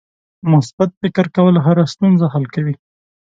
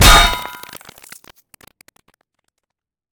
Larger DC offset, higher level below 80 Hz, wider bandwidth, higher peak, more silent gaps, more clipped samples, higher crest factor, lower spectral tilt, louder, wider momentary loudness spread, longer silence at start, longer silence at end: neither; second, -56 dBFS vs -22 dBFS; second, 7.8 kHz vs over 20 kHz; about the same, 0 dBFS vs 0 dBFS; first, 0.73-0.78 s, 0.97-1.01 s vs none; second, under 0.1% vs 0.2%; about the same, 14 dB vs 18 dB; first, -8.5 dB/octave vs -2 dB/octave; second, -15 LUFS vs -12 LUFS; second, 10 LU vs 29 LU; first, 0.45 s vs 0 s; second, 0.5 s vs 2.65 s